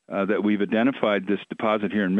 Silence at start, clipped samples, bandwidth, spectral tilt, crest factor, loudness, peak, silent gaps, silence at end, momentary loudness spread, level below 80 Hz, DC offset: 0.1 s; under 0.1%; 4.1 kHz; -8.5 dB/octave; 16 dB; -24 LUFS; -6 dBFS; none; 0 s; 4 LU; -70 dBFS; under 0.1%